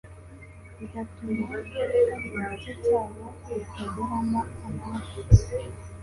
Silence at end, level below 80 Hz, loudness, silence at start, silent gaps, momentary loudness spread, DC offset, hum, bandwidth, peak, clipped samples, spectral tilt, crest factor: 0 s; -36 dBFS; -28 LUFS; 0.05 s; none; 21 LU; under 0.1%; none; 11.5 kHz; -2 dBFS; under 0.1%; -7.5 dB/octave; 24 dB